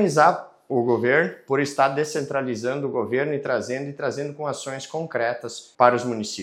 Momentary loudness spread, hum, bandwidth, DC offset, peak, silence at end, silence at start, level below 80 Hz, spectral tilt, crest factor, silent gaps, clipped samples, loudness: 11 LU; none; 14.5 kHz; under 0.1%; 0 dBFS; 0 s; 0 s; -78 dBFS; -5 dB/octave; 22 dB; none; under 0.1%; -23 LUFS